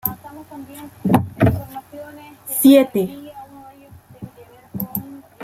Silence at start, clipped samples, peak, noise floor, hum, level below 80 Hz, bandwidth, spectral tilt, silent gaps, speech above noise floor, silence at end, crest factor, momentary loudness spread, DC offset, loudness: 0.05 s; under 0.1%; -2 dBFS; -45 dBFS; none; -46 dBFS; 16.5 kHz; -6 dB/octave; none; 29 dB; 0 s; 20 dB; 26 LU; under 0.1%; -18 LUFS